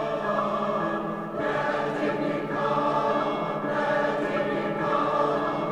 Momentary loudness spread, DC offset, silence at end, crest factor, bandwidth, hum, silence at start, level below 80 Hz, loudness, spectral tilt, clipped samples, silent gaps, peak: 4 LU; 0.1%; 0 s; 14 dB; 11.5 kHz; none; 0 s; -62 dBFS; -26 LUFS; -6.5 dB/octave; under 0.1%; none; -12 dBFS